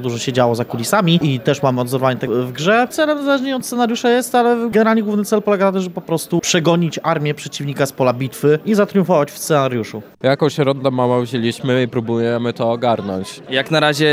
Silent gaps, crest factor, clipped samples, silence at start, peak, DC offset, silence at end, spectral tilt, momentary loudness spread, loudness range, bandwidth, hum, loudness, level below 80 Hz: none; 16 dB; under 0.1%; 0 s; 0 dBFS; under 0.1%; 0 s; -5.5 dB/octave; 6 LU; 2 LU; 16 kHz; none; -17 LUFS; -60 dBFS